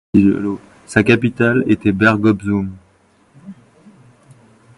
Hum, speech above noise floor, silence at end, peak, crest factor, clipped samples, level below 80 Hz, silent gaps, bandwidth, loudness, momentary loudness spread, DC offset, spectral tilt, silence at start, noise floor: none; 40 dB; 1.25 s; 0 dBFS; 18 dB; under 0.1%; -44 dBFS; none; 11.5 kHz; -15 LUFS; 9 LU; under 0.1%; -7 dB/octave; 0.15 s; -54 dBFS